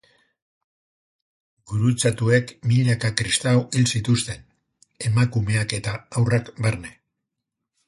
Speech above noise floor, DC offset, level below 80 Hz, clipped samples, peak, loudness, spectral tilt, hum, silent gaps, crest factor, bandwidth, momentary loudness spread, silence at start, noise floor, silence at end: 61 dB; under 0.1%; -50 dBFS; under 0.1%; -2 dBFS; -22 LUFS; -5 dB/octave; none; none; 22 dB; 11.5 kHz; 10 LU; 1.7 s; -82 dBFS; 0.95 s